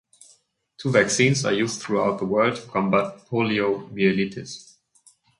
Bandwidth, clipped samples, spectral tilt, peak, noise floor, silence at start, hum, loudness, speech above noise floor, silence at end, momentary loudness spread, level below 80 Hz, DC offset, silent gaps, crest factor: 11.5 kHz; under 0.1%; -4.5 dB/octave; -4 dBFS; -60 dBFS; 0.8 s; none; -22 LUFS; 38 dB; 0.75 s; 10 LU; -60 dBFS; under 0.1%; none; 20 dB